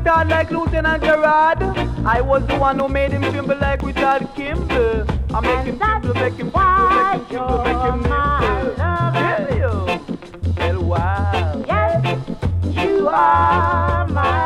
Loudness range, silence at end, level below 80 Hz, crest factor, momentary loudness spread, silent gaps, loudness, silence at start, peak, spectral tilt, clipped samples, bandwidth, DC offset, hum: 3 LU; 0 s; -28 dBFS; 14 dB; 7 LU; none; -18 LUFS; 0 s; -4 dBFS; -7.5 dB/octave; under 0.1%; 10.5 kHz; under 0.1%; none